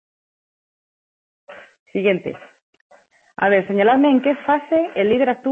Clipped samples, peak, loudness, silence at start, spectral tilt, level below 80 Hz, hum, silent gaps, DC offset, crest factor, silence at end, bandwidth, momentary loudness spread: under 0.1%; -4 dBFS; -18 LUFS; 1.5 s; -8 dB/octave; -62 dBFS; none; 1.79-1.86 s, 2.62-2.73 s, 2.81-2.90 s; under 0.1%; 16 dB; 0 s; 3.9 kHz; 10 LU